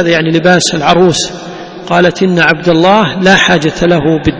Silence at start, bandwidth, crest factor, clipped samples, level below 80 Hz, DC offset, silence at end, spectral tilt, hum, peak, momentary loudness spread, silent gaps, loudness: 0 s; 8 kHz; 8 dB; 0.9%; -36 dBFS; under 0.1%; 0 s; -4.5 dB/octave; none; 0 dBFS; 8 LU; none; -8 LUFS